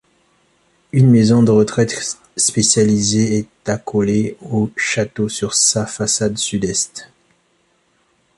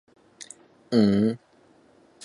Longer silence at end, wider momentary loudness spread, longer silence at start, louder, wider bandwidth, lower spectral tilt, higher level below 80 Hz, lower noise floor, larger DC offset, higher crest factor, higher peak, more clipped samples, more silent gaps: first, 1.3 s vs 0.9 s; second, 9 LU vs 23 LU; first, 0.95 s vs 0.4 s; first, -16 LUFS vs -23 LUFS; about the same, 11.5 kHz vs 11.5 kHz; second, -4.5 dB/octave vs -7 dB/octave; first, -50 dBFS vs -60 dBFS; about the same, -61 dBFS vs -58 dBFS; neither; about the same, 16 dB vs 20 dB; first, 0 dBFS vs -8 dBFS; neither; neither